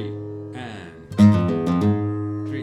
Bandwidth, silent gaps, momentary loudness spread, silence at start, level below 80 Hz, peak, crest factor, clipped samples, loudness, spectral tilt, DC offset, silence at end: 11 kHz; none; 19 LU; 0 s; -52 dBFS; -2 dBFS; 18 dB; under 0.1%; -20 LUFS; -8.5 dB/octave; under 0.1%; 0 s